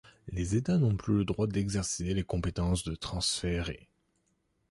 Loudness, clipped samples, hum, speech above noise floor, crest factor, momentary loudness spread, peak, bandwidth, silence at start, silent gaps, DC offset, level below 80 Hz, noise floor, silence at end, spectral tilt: -31 LUFS; under 0.1%; none; 45 dB; 16 dB; 8 LU; -16 dBFS; 11.5 kHz; 0.25 s; none; under 0.1%; -44 dBFS; -75 dBFS; 0.95 s; -5 dB/octave